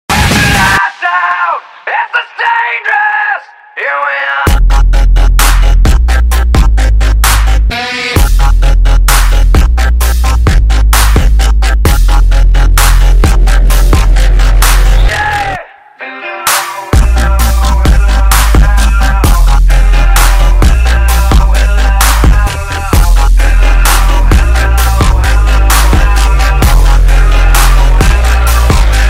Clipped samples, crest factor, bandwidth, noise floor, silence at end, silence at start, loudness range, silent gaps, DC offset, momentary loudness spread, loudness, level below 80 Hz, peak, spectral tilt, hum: 0.3%; 6 dB; 16.5 kHz; -27 dBFS; 0 s; 0.1 s; 2 LU; none; under 0.1%; 4 LU; -9 LUFS; -6 dBFS; 0 dBFS; -4 dB/octave; none